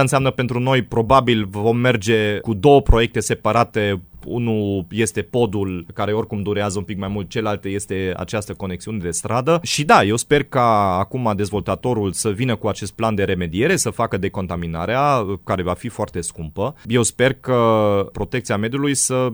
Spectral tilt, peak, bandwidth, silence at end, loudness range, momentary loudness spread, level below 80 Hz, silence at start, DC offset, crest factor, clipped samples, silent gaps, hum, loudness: -5 dB/octave; 0 dBFS; over 20 kHz; 0 s; 6 LU; 10 LU; -36 dBFS; 0 s; under 0.1%; 18 dB; under 0.1%; none; none; -19 LUFS